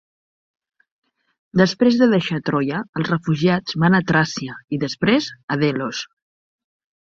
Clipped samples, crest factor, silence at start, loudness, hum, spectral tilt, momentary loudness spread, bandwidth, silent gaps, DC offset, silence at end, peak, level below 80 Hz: under 0.1%; 18 dB; 1.55 s; -19 LUFS; none; -6 dB/octave; 10 LU; 7.6 kHz; 2.89-2.93 s, 5.43-5.48 s; under 0.1%; 1.15 s; -2 dBFS; -58 dBFS